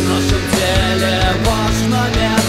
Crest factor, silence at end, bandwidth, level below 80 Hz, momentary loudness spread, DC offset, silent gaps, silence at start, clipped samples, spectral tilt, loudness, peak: 12 dB; 0 s; 16 kHz; -24 dBFS; 1 LU; 0.7%; none; 0 s; under 0.1%; -4.5 dB/octave; -15 LUFS; -2 dBFS